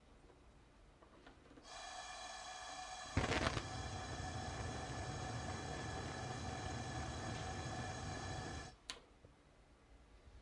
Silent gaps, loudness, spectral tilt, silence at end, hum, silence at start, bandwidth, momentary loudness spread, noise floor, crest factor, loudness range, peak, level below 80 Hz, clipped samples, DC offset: none; -46 LUFS; -4 dB/octave; 0 s; none; 0 s; 11.5 kHz; 24 LU; -67 dBFS; 28 dB; 5 LU; -18 dBFS; -58 dBFS; under 0.1%; under 0.1%